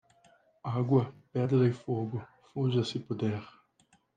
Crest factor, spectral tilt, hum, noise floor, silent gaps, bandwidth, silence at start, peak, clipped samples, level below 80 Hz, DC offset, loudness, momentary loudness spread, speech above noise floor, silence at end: 18 dB; -8 dB/octave; none; -69 dBFS; none; 8.8 kHz; 0.65 s; -14 dBFS; under 0.1%; -72 dBFS; under 0.1%; -31 LUFS; 13 LU; 39 dB; 0.65 s